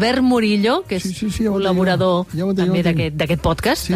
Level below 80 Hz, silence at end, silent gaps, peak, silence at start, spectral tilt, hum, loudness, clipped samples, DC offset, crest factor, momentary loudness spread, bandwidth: -38 dBFS; 0 s; none; -6 dBFS; 0 s; -6 dB/octave; none; -18 LUFS; under 0.1%; under 0.1%; 12 dB; 5 LU; 15.5 kHz